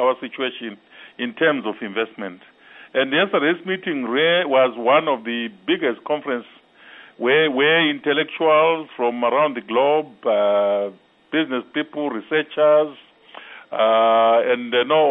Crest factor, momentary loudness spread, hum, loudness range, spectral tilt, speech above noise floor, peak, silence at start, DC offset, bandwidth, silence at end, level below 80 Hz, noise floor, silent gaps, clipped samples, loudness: 16 dB; 11 LU; none; 4 LU; -8 dB/octave; 26 dB; -4 dBFS; 0 s; under 0.1%; 3.9 kHz; 0 s; -76 dBFS; -46 dBFS; none; under 0.1%; -19 LUFS